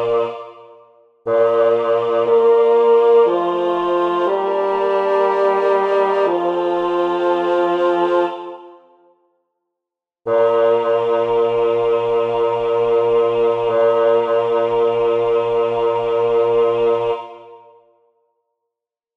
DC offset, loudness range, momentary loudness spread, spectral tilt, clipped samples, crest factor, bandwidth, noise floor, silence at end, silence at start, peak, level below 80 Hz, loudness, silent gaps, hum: under 0.1%; 5 LU; 6 LU; -7 dB/octave; under 0.1%; 12 dB; 5.8 kHz; -85 dBFS; 1.6 s; 0 s; -4 dBFS; -56 dBFS; -16 LUFS; none; none